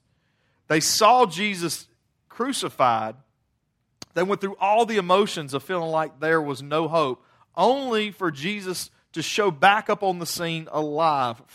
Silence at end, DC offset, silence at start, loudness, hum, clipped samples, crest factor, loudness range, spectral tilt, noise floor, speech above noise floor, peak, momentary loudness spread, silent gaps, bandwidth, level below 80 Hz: 0.2 s; under 0.1%; 0.7 s; -23 LUFS; none; under 0.1%; 20 dB; 3 LU; -3.5 dB/octave; -72 dBFS; 50 dB; -4 dBFS; 12 LU; none; 16 kHz; -70 dBFS